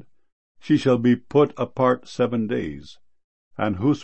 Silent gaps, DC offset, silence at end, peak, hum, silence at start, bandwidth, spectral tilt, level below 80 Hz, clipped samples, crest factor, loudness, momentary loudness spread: 3.24-3.51 s; 0.5%; 0 s; -6 dBFS; none; 0.65 s; 8.6 kHz; -7.5 dB/octave; -56 dBFS; under 0.1%; 18 dB; -22 LUFS; 10 LU